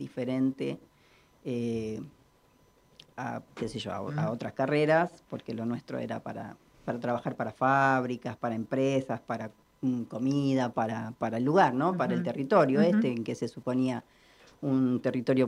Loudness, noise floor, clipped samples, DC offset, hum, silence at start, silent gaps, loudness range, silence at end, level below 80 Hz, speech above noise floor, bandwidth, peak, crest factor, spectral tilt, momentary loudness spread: -30 LUFS; -64 dBFS; under 0.1%; under 0.1%; none; 0 s; none; 9 LU; 0 s; -68 dBFS; 35 dB; 11 kHz; -10 dBFS; 20 dB; -7 dB/octave; 14 LU